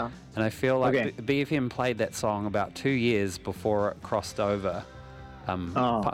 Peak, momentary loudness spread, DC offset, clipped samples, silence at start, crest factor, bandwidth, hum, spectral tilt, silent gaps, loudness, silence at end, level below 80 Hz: -12 dBFS; 9 LU; under 0.1%; under 0.1%; 0 s; 16 dB; 16 kHz; none; -6 dB/octave; none; -28 LUFS; 0 s; -54 dBFS